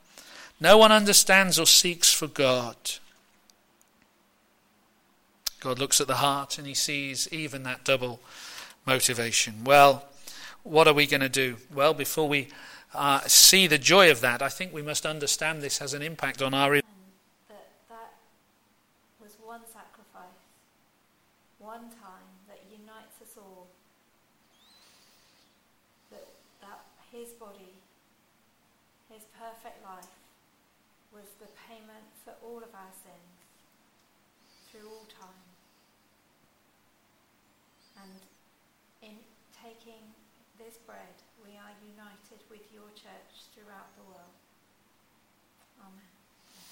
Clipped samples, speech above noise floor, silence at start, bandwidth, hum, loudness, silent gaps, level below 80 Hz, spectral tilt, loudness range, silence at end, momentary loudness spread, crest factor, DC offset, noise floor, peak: under 0.1%; 42 dB; 0.35 s; 16.5 kHz; none; -22 LUFS; none; -62 dBFS; -1.5 dB/octave; 12 LU; 14.05 s; 26 LU; 26 dB; under 0.1%; -67 dBFS; -2 dBFS